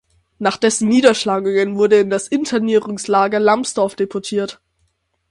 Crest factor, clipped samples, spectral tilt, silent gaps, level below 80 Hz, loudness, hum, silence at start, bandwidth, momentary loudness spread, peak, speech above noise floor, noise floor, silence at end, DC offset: 16 dB; under 0.1%; -4 dB/octave; none; -60 dBFS; -16 LUFS; none; 0.4 s; 11.5 kHz; 9 LU; 0 dBFS; 50 dB; -66 dBFS; 0.8 s; under 0.1%